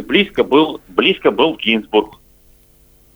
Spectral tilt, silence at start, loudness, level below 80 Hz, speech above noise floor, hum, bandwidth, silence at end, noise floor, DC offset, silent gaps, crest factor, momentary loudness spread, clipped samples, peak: -6 dB/octave; 0 s; -15 LUFS; -50 dBFS; 35 dB; none; over 20 kHz; 1.05 s; -50 dBFS; under 0.1%; none; 16 dB; 4 LU; under 0.1%; 0 dBFS